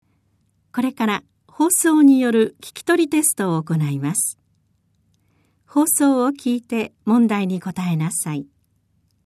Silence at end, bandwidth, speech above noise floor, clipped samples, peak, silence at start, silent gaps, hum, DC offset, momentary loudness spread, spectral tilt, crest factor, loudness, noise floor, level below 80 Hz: 0.8 s; 14 kHz; 46 dB; under 0.1%; -4 dBFS; 0.75 s; none; none; under 0.1%; 11 LU; -5 dB/octave; 16 dB; -19 LUFS; -64 dBFS; -68 dBFS